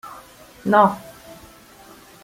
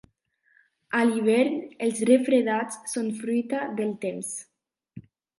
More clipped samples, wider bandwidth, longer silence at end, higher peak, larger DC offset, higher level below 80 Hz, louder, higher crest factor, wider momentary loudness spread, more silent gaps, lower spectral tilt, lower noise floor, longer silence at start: neither; first, 16.5 kHz vs 11.5 kHz; first, 1.25 s vs 0.4 s; first, -2 dBFS vs -8 dBFS; neither; first, -58 dBFS vs -74 dBFS; first, -18 LUFS vs -25 LUFS; about the same, 22 dB vs 20 dB; first, 26 LU vs 10 LU; neither; first, -6.5 dB/octave vs -4.5 dB/octave; second, -46 dBFS vs -68 dBFS; second, 0.05 s vs 0.9 s